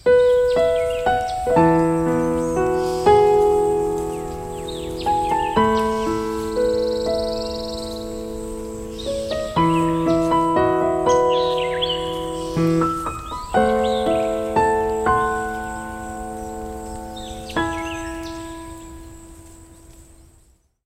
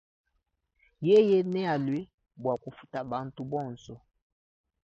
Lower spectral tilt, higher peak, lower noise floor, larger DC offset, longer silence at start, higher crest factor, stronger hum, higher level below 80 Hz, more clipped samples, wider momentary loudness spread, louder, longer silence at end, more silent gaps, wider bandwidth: second, -5.5 dB/octave vs -8 dB/octave; first, -2 dBFS vs -12 dBFS; second, -56 dBFS vs -78 dBFS; neither; second, 0.05 s vs 1 s; about the same, 18 dB vs 18 dB; neither; first, -40 dBFS vs -68 dBFS; neither; second, 14 LU vs 18 LU; first, -20 LUFS vs -28 LUFS; about the same, 0.85 s vs 0.9 s; second, none vs 2.14-2.18 s; first, 16 kHz vs 7.4 kHz